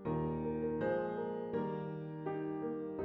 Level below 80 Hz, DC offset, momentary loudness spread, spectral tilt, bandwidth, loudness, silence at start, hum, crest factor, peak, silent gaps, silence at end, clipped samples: -60 dBFS; under 0.1%; 6 LU; -10.5 dB/octave; 5.2 kHz; -39 LUFS; 0 s; none; 14 dB; -24 dBFS; none; 0 s; under 0.1%